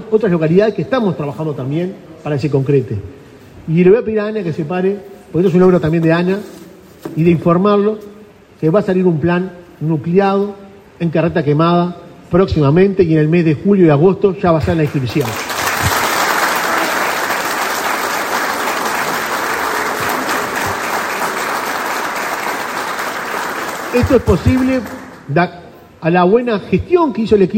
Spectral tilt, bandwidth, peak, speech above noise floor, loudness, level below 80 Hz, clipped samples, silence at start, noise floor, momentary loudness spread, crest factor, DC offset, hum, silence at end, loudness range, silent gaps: -6 dB/octave; 16.5 kHz; 0 dBFS; 27 dB; -15 LUFS; -42 dBFS; under 0.1%; 0 s; -40 dBFS; 10 LU; 14 dB; under 0.1%; none; 0 s; 5 LU; none